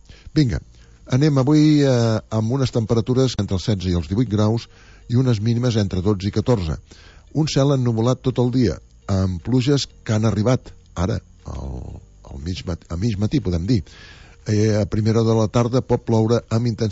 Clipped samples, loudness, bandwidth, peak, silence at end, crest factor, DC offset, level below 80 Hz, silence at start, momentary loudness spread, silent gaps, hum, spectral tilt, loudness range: under 0.1%; -20 LUFS; 8 kHz; -4 dBFS; 0 s; 14 dB; under 0.1%; -40 dBFS; 0.1 s; 12 LU; none; none; -7 dB/octave; 6 LU